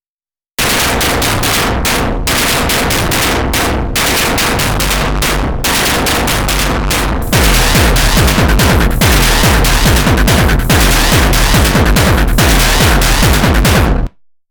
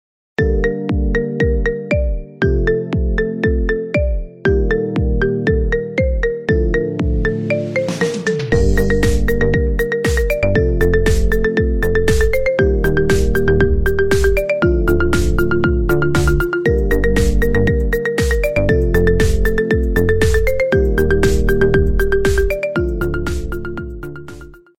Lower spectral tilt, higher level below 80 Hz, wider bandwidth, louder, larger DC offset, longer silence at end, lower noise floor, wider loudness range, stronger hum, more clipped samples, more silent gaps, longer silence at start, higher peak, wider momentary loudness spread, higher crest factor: second, -3.5 dB/octave vs -6.5 dB/octave; first, -14 dBFS vs -20 dBFS; first, over 20 kHz vs 16.5 kHz; first, -10 LUFS vs -16 LUFS; second, under 0.1% vs 2%; first, 0.4 s vs 0 s; first, under -90 dBFS vs -36 dBFS; about the same, 3 LU vs 3 LU; neither; neither; neither; first, 0.6 s vs 0.35 s; about the same, 0 dBFS vs -2 dBFS; about the same, 4 LU vs 5 LU; about the same, 10 dB vs 14 dB